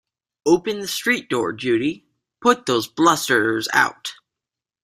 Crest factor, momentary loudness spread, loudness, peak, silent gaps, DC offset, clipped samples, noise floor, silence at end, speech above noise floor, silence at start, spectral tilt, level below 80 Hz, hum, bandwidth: 20 dB; 9 LU; -20 LUFS; 0 dBFS; none; under 0.1%; under 0.1%; -87 dBFS; 0.7 s; 68 dB; 0.45 s; -3.5 dB/octave; -62 dBFS; none; 16 kHz